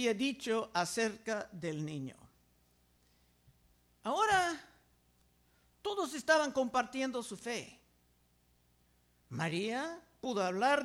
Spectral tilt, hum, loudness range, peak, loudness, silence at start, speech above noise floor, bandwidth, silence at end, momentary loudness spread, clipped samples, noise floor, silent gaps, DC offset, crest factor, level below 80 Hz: -4 dB/octave; 60 Hz at -75 dBFS; 7 LU; -16 dBFS; -35 LUFS; 0 s; 37 dB; over 20 kHz; 0 s; 14 LU; under 0.1%; -71 dBFS; none; under 0.1%; 22 dB; -72 dBFS